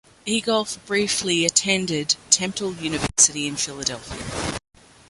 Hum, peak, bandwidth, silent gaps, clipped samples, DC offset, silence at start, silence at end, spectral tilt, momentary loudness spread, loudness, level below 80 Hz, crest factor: none; -2 dBFS; 12 kHz; none; under 0.1%; under 0.1%; 0.25 s; 0.5 s; -2 dB/octave; 12 LU; -21 LUFS; -48 dBFS; 22 dB